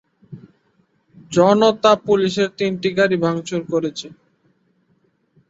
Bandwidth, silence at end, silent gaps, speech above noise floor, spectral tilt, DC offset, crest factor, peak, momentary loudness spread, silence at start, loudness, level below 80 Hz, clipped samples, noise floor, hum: 8 kHz; 1.35 s; none; 46 dB; -5.5 dB/octave; under 0.1%; 18 dB; -2 dBFS; 10 LU; 0.3 s; -18 LUFS; -60 dBFS; under 0.1%; -63 dBFS; none